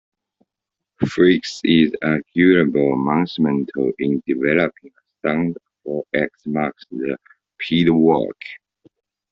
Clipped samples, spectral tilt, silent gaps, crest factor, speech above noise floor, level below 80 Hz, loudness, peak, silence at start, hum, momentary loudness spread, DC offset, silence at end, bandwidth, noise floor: under 0.1%; -5 dB/octave; none; 18 dB; 66 dB; -56 dBFS; -19 LUFS; -2 dBFS; 1 s; none; 13 LU; under 0.1%; 0.75 s; 7.6 kHz; -84 dBFS